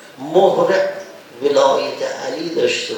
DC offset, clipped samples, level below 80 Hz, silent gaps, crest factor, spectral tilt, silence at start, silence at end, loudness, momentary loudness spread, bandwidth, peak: under 0.1%; under 0.1%; -74 dBFS; none; 16 dB; -4 dB/octave; 0 s; 0 s; -17 LUFS; 10 LU; 19.5 kHz; 0 dBFS